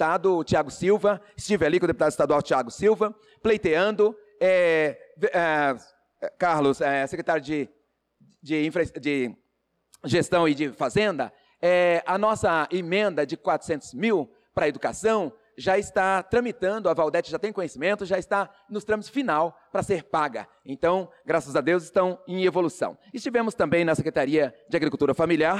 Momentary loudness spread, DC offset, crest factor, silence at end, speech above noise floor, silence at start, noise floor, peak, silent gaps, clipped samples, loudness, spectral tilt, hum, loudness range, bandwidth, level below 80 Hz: 8 LU; under 0.1%; 12 dB; 0 s; 50 dB; 0 s; -74 dBFS; -12 dBFS; none; under 0.1%; -25 LUFS; -5.5 dB/octave; none; 4 LU; 12.5 kHz; -58 dBFS